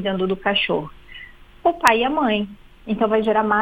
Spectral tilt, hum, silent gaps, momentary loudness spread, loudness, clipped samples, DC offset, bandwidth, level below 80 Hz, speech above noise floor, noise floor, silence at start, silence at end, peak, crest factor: -4.5 dB/octave; none; none; 22 LU; -20 LUFS; under 0.1%; under 0.1%; 16 kHz; -48 dBFS; 22 dB; -42 dBFS; 0 s; 0 s; 0 dBFS; 20 dB